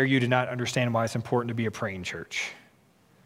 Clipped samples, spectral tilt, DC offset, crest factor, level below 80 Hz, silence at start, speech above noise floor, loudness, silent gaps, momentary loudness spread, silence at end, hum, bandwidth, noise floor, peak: under 0.1%; -5.5 dB/octave; under 0.1%; 20 dB; -64 dBFS; 0 s; 34 dB; -28 LUFS; none; 8 LU; 0.65 s; none; 15.5 kHz; -61 dBFS; -8 dBFS